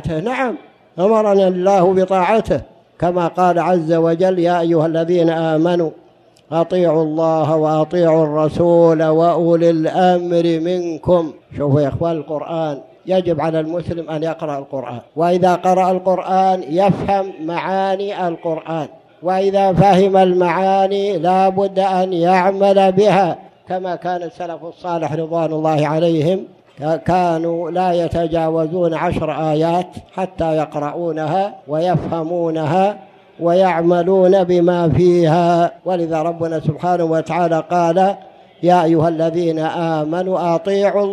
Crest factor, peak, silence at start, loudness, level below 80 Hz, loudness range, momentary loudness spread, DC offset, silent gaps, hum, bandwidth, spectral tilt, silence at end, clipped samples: 14 dB; 0 dBFS; 0 s; -16 LUFS; -48 dBFS; 5 LU; 10 LU; under 0.1%; none; none; 11 kHz; -7.5 dB/octave; 0 s; under 0.1%